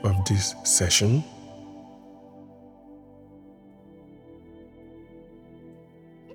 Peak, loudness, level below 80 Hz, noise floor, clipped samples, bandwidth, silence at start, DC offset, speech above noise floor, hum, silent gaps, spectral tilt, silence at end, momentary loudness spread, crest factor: -6 dBFS; -22 LUFS; -52 dBFS; -51 dBFS; under 0.1%; 17.5 kHz; 0 s; under 0.1%; 28 dB; none; none; -3.5 dB/octave; 0 s; 29 LU; 22 dB